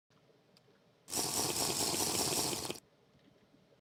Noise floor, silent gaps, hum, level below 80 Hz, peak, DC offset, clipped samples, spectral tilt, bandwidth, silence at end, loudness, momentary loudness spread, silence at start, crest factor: -68 dBFS; none; none; -68 dBFS; -18 dBFS; under 0.1%; under 0.1%; -1.5 dB/octave; over 20 kHz; 1 s; -33 LUFS; 8 LU; 1.1 s; 20 dB